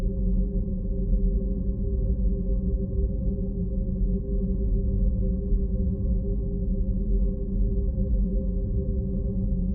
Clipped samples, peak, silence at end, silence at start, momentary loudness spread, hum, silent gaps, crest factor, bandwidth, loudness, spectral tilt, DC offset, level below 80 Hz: under 0.1%; -12 dBFS; 0 s; 0 s; 3 LU; none; none; 12 dB; 1.1 kHz; -28 LUFS; -17.5 dB/octave; under 0.1%; -26 dBFS